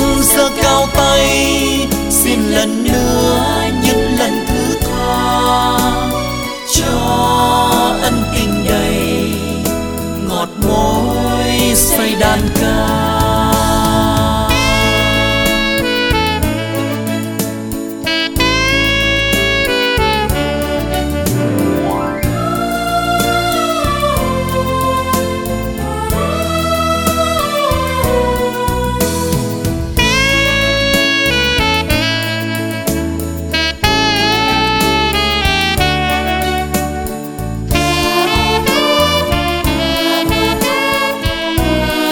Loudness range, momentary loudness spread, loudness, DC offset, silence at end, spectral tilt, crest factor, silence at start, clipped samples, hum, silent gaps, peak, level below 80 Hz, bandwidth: 3 LU; 7 LU; -13 LUFS; under 0.1%; 0 s; -4 dB/octave; 14 dB; 0 s; under 0.1%; none; none; 0 dBFS; -24 dBFS; over 20 kHz